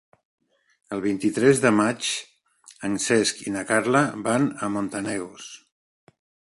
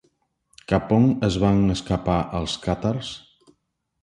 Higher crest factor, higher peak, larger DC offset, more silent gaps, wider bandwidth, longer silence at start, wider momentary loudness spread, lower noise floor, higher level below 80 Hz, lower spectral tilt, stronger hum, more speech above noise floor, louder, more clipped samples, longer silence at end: about the same, 22 dB vs 20 dB; about the same, -4 dBFS vs -4 dBFS; neither; neither; about the same, 11.5 kHz vs 11 kHz; first, 0.9 s vs 0.7 s; first, 14 LU vs 9 LU; second, -53 dBFS vs -73 dBFS; second, -62 dBFS vs -40 dBFS; second, -4 dB/octave vs -6.5 dB/octave; neither; second, 31 dB vs 52 dB; about the same, -23 LUFS vs -22 LUFS; neither; about the same, 0.9 s vs 0.85 s